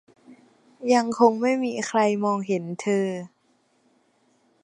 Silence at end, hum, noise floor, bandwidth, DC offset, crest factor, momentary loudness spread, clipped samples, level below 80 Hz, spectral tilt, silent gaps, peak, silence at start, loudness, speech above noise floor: 1.35 s; none; -66 dBFS; 11 kHz; under 0.1%; 22 dB; 11 LU; under 0.1%; -76 dBFS; -5.5 dB/octave; none; -4 dBFS; 0.3 s; -23 LUFS; 43 dB